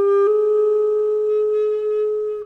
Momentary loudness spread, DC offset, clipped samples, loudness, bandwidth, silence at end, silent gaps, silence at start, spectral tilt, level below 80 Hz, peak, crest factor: 5 LU; under 0.1%; under 0.1%; -19 LUFS; 4 kHz; 0 s; none; 0 s; -6 dB/octave; -62 dBFS; -10 dBFS; 8 dB